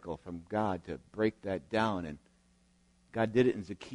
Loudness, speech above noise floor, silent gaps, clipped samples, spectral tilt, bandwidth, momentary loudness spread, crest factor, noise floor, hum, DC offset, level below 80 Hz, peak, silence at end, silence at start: -34 LUFS; 35 dB; none; under 0.1%; -7 dB/octave; 10.5 kHz; 14 LU; 20 dB; -68 dBFS; none; under 0.1%; -62 dBFS; -14 dBFS; 0 s; 0.05 s